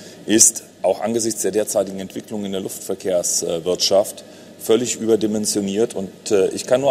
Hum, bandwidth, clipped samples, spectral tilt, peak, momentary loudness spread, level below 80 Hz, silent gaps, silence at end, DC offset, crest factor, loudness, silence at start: none; 16 kHz; under 0.1%; -3 dB/octave; 0 dBFS; 13 LU; -60 dBFS; none; 0 s; under 0.1%; 20 dB; -19 LUFS; 0 s